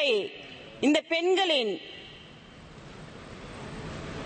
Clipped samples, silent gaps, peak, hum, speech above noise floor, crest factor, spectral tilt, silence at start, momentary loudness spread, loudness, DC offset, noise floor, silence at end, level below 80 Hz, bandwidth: under 0.1%; none; -12 dBFS; none; 23 dB; 18 dB; -4 dB/octave; 0 s; 23 LU; -27 LUFS; under 0.1%; -49 dBFS; 0 s; -56 dBFS; 8.8 kHz